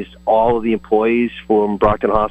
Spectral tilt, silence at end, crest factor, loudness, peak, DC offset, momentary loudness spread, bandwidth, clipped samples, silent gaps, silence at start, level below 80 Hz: -8.5 dB/octave; 0 s; 14 dB; -16 LUFS; -2 dBFS; under 0.1%; 3 LU; 8.2 kHz; under 0.1%; none; 0 s; -36 dBFS